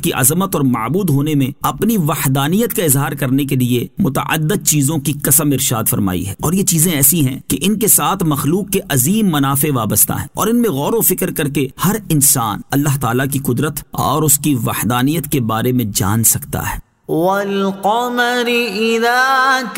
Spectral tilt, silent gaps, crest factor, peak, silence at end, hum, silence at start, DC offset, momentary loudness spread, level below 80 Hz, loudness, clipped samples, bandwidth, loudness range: -4 dB/octave; none; 14 dB; 0 dBFS; 0 s; none; 0 s; 0.5%; 7 LU; -42 dBFS; -14 LUFS; under 0.1%; 16.5 kHz; 2 LU